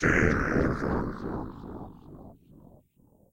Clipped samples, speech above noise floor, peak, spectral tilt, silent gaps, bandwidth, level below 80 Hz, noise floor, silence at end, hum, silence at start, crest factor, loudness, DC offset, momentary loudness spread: under 0.1%; 24 dB; -8 dBFS; -7 dB/octave; none; 16 kHz; -40 dBFS; -62 dBFS; 1 s; none; 0 s; 22 dB; -28 LUFS; under 0.1%; 24 LU